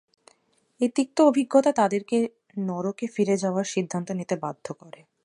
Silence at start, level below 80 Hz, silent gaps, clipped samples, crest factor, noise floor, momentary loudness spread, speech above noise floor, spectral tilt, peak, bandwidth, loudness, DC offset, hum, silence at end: 0.8 s; -76 dBFS; none; under 0.1%; 20 dB; -66 dBFS; 12 LU; 42 dB; -6 dB/octave; -6 dBFS; 11.5 kHz; -25 LUFS; under 0.1%; none; 0.35 s